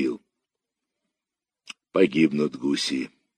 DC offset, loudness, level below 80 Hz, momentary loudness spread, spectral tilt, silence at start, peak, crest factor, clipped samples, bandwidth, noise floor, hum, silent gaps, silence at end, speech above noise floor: under 0.1%; -24 LUFS; -70 dBFS; 20 LU; -5 dB/octave; 0 s; -6 dBFS; 20 dB; under 0.1%; 13.5 kHz; -89 dBFS; none; none; 0.3 s; 66 dB